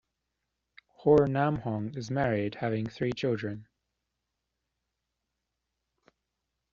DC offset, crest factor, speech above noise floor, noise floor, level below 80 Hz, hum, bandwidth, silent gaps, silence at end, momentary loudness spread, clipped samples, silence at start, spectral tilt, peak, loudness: under 0.1%; 22 dB; 56 dB; -84 dBFS; -62 dBFS; none; 7.4 kHz; none; 3.1 s; 11 LU; under 0.1%; 1.05 s; -6.5 dB/octave; -10 dBFS; -29 LUFS